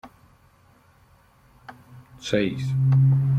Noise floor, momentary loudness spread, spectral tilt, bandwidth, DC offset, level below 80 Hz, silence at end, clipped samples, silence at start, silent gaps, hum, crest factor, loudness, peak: -57 dBFS; 17 LU; -7.5 dB/octave; 7.8 kHz; under 0.1%; -54 dBFS; 0 s; under 0.1%; 0.05 s; none; none; 16 dB; -22 LUFS; -8 dBFS